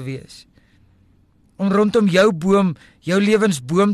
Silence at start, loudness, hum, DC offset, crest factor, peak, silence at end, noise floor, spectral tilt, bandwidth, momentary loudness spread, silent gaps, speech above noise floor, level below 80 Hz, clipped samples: 0 s; -17 LUFS; none; under 0.1%; 14 dB; -6 dBFS; 0 s; -55 dBFS; -6 dB/octave; 13 kHz; 13 LU; none; 38 dB; -54 dBFS; under 0.1%